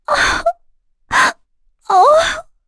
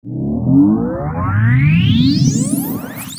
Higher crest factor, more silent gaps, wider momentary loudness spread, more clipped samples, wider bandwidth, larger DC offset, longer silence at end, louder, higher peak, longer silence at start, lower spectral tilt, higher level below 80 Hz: about the same, 14 dB vs 12 dB; neither; about the same, 9 LU vs 9 LU; neither; second, 11 kHz vs 16.5 kHz; neither; first, 0.25 s vs 0 s; about the same, -14 LUFS vs -14 LUFS; about the same, -2 dBFS vs -2 dBFS; about the same, 0.1 s vs 0.05 s; second, -1.5 dB/octave vs -6 dB/octave; about the same, -40 dBFS vs -36 dBFS